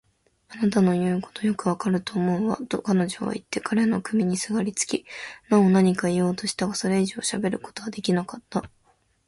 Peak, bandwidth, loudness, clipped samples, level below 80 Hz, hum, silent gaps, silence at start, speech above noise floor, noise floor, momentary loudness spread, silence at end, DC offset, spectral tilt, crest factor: -6 dBFS; 11.5 kHz; -24 LUFS; under 0.1%; -60 dBFS; none; none; 0.5 s; 41 dB; -65 dBFS; 10 LU; 0.6 s; under 0.1%; -5.5 dB/octave; 18 dB